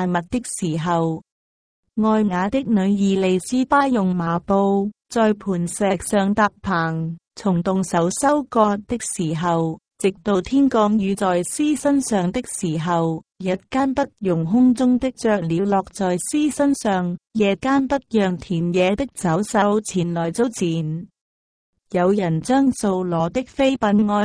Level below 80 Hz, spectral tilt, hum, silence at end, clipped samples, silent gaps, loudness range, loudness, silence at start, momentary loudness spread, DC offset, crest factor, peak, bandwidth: -50 dBFS; -6 dB/octave; none; 0 s; under 0.1%; 1.32-1.83 s, 21.21-21.73 s; 2 LU; -20 LUFS; 0 s; 6 LU; under 0.1%; 16 dB; -4 dBFS; 11 kHz